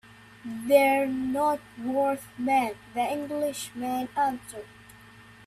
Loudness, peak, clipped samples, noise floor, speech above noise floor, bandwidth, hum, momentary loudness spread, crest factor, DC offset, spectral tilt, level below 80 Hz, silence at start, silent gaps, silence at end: -27 LUFS; -8 dBFS; under 0.1%; -51 dBFS; 24 dB; 15 kHz; none; 17 LU; 20 dB; under 0.1%; -4 dB/octave; -64 dBFS; 0.45 s; none; 0.15 s